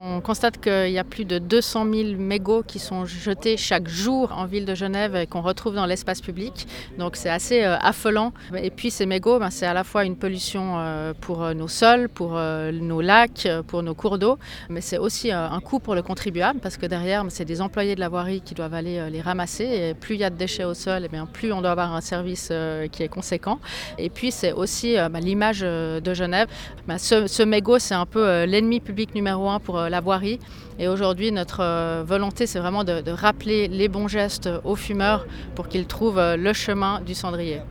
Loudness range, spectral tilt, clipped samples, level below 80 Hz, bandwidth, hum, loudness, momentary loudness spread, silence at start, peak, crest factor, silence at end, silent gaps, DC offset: 5 LU; -4.5 dB/octave; under 0.1%; -44 dBFS; 19 kHz; none; -23 LUFS; 9 LU; 0 s; 0 dBFS; 24 dB; 0 s; none; under 0.1%